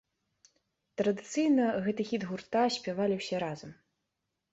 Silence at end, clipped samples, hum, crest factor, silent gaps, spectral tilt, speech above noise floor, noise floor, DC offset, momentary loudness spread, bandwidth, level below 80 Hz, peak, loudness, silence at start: 0.8 s; under 0.1%; none; 16 dB; none; -5.5 dB/octave; 54 dB; -84 dBFS; under 0.1%; 11 LU; 8.2 kHz; -72 dBFS; -18 dBFS; -31 LUFS; 1 s